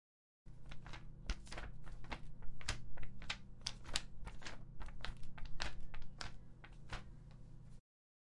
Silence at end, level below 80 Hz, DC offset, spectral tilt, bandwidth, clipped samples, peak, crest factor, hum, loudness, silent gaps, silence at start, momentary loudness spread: 0.45 s; -52 dBFS; under 0.1%; -3 dB/octave; 11.5 kHz; under 0.1%; -14 dBFS; 28 dB; none; -50 LUFS; none; 0.45 s; 15 LU